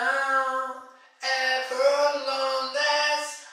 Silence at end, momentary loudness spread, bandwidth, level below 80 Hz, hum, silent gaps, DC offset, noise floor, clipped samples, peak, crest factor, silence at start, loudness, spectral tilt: 0 s; 9 LU; 13.5 kHz; under -90 dBFS; none; none; under 0.1%; -46 dBFS; under 0.1%; -10 dBFS; 16 dB; 0 s; -24 LUFS; 2.5 dB/octave